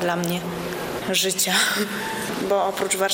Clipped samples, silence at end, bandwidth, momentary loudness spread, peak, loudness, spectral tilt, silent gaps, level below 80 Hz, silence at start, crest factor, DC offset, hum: under 0.1%; 0 s; 17 kHz; 9 LU; -6 dBFS; -22 LUFS; -2.5 dB/octave; none; -54 dBFS; 0 s; 16 dB; under 0.1%; none